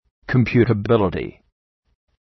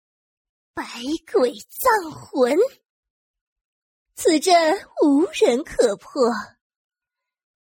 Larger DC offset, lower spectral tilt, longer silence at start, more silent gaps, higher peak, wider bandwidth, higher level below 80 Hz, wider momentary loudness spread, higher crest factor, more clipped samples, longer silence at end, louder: neither; first, -9.5 dB/octave vs -3 dB/octave; second, 0.3 s vs 0.75 s; second, none vs 2.90-3.03 s, 3.10-3.34 s, 3.41-3.56 s, 3.65-4.06 s; about the same, -2 dBFS vs -4 dBFS; second, 6 kHz vs 16.5 kHz; first, -44 dBFS vs -58 dBFS; about the same, 11 LU vs 13 LU; about the same, 18 dB vs 18 dB; neither; second, 0.9 s vs 1.2 s; about the same, -19 LUFS vs -20 LUFS